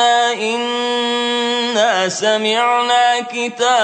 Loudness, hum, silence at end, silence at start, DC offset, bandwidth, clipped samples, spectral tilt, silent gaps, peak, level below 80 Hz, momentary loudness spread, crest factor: -16 LUFS; none; 0 s; 0 s; under 0.1%; 9.2 kHz; under 0.1%; -1.5 dB/octave; none; -2 dBFS; -76 dBFS; 5 LU; 14 dB